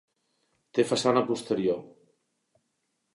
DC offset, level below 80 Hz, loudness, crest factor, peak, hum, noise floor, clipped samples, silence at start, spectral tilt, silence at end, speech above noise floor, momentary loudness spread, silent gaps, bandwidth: under 0.1%; -72 dBFS; -27 LUFS; 22 dB; -8 dBFS; none; -78 dBFS; under 0.1%; 0.75 s; -5 dB/octave; 1.25 s; 52 dB; 7 LU; none; 11.5 kHz